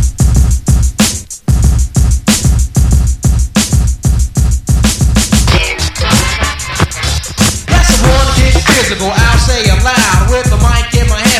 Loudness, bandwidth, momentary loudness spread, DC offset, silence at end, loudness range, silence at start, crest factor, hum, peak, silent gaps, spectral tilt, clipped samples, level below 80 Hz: -10 LUFS; 15 kHz; 5 LU; under 0.1%; 0 s; 2 LU; 0 s; 10 dB; none; 0 dBFS; none; -4 dB/octave; 0.7%; -12 dBFS